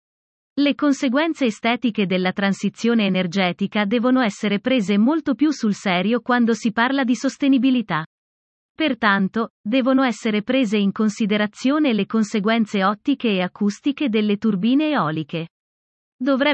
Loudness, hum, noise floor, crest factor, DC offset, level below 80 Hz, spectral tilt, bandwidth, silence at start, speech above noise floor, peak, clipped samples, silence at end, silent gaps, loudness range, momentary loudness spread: -20 LUFS; none; under -90 dBFS; 16 dB; under 0.1%; -66 dBFS; -5.5 dB/octave; 8.6 kHz; 0.55 s; over 71 dB; -4 dBFS; under 0.1%; 0 s; 8.06-8.75 s, 9.50-9.64 s, 15.50-16.19 s; 2 LU; 5 LU